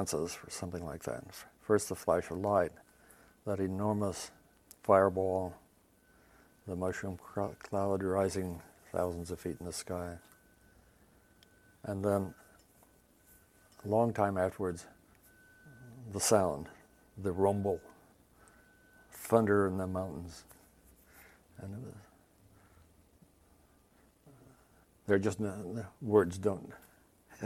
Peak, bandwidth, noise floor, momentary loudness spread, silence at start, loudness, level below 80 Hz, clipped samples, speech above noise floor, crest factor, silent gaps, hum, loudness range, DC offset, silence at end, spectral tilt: -10 dBFS; 16.5 kHz; -67 dBFS; 19 LU; 0 s; -34 LUFS; -66 dBFS; under 0.1%; 34 dB; 26 dB; none; none; 8 LU; under 0.1%; 0 s; -5.5 dB/octave